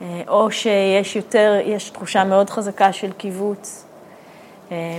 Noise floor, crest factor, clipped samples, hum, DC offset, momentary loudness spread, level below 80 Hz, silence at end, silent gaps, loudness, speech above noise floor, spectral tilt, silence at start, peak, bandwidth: -43 dBFS; 20 dB; under 0.1%; none; under 0.1%; 13 LU; -70 dBFS; 0 s; none; -18 LUFS; 25 dB; -4.5 dB/octave; 0 s; 0 dBFS; 15.5 kHz